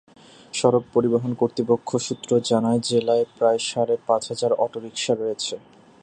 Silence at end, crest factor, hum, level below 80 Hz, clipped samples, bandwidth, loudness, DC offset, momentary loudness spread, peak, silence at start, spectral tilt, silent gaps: 0.45 s; 20 dB; none; -64 dBFS; under 0.1%; 9.8 kHz; -22 LUFS; under 0.1%; 6 LU; -4 dBFS; 0.55 s; -5 dB/octave; none